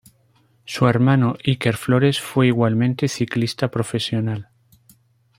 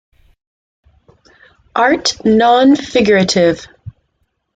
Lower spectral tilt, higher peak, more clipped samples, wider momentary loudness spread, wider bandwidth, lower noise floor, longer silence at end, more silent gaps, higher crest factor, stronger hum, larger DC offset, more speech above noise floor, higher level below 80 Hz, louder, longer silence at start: first, -6.5 dB/octave vs -4.5 dB/octave; about the same, -2 dBFS vs 0 dBFS; neither; second, 7 LU vs 12 LU; first, 16 kHz vs 9.2 kHz; second, -59 dBFS vs -66 dBFS; first, 0.95 s vs 0.65 s; neither; about the same, 18 dB vs 14 dB; neither; neither; second, 40 dB vs 54 dB; second, -56 dBFS vs -48 dBFS; second, -20 LUFS vs -12 LUFS; second, 0.65 s vs 1.75 s